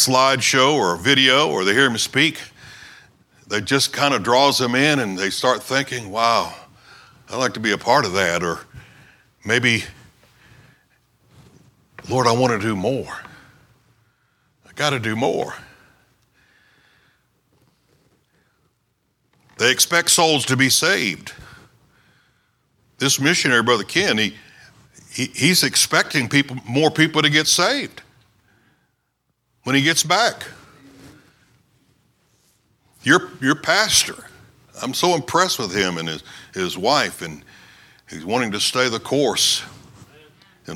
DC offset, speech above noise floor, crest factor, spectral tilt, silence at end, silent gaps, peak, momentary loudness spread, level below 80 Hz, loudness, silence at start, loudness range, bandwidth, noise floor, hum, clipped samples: under 0.1%; 52 dB; 20 dB; -2.5 dB/octave; 0 s; none; 0 dBFS; 17 LU; -58 dBFS; -18 LUFS; 0 s; 8 LU; 17.5 kHz; -71 dBFS; none; under 0.1%